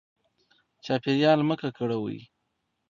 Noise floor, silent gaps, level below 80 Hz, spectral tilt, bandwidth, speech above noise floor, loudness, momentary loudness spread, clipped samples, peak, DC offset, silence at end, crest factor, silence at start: -78 dBFS; none; -70 dBFS; -7 dB/octave; 7.4 kHz; 53 dB; -26 LUFS; 17 LU; under 0.1%; -8 dBFS; under 0.1%; 0.7 s; 20 dB; 0.85 s